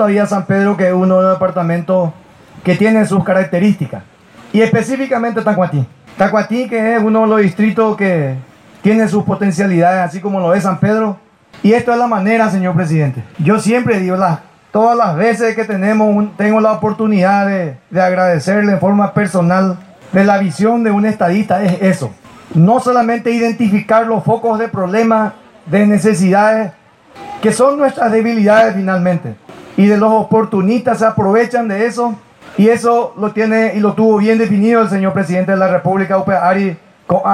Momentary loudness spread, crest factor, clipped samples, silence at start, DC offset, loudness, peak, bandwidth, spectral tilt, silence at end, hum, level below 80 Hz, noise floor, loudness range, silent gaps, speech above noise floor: 7 LU; 12 dB; under 0.1%; 0 s; under 0.1%; -13 LUFS; 0 dBFS; 12 kHz; -7 dB/octave; 0 s; none; -54 dBFS; -35 dBFS; 2 LU; none; 23 dB